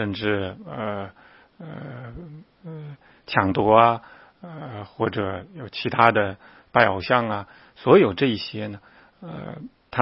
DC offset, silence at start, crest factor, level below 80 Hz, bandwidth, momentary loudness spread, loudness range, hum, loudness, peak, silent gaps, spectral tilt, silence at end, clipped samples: under 0.1%; 0 s; 24 dB; -56 dBFS; 5.8 kHz; 24 LU; 8 LU; none; -22 LUFS; 0 dBFS; none; -9 dB/octave; 0 s; under 0.1%